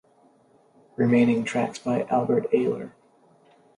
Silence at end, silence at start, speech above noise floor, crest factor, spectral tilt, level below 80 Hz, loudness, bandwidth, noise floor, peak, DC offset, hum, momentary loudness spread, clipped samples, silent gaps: 0.9 s; 1 s; 37 dB; 18 dB; -7 dB/octave; -66 dBFS; -24 LUFS; 10.5 kHz; -59 dBFS; -8 dBFS; under 0.1%; none; 13 LU; under 0.1%; none